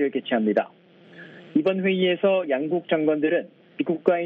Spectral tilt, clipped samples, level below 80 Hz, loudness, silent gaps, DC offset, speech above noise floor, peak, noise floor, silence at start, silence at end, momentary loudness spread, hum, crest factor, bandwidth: -9 dB/octave; under 0.1%; -72 dBFS; -23 LUFS; none; under 0.1%; 24 dB; -4 dBFS; -47 dBFS; 0 s; 0 s; 12 LU; none; 20 dB; 5 kHz